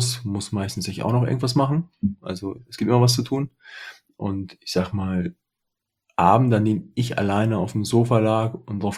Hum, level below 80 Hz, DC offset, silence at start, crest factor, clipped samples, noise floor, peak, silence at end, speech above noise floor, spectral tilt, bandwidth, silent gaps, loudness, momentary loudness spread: none; -58 dBFS; under 0.1%; 0 s; 20 dB; under 0.1%; -81 dBFS; -2 dBFS; 0 s; 59 dB; -6 dB/octave; 14.5 kHz; none; -23 LUFS; 14 LU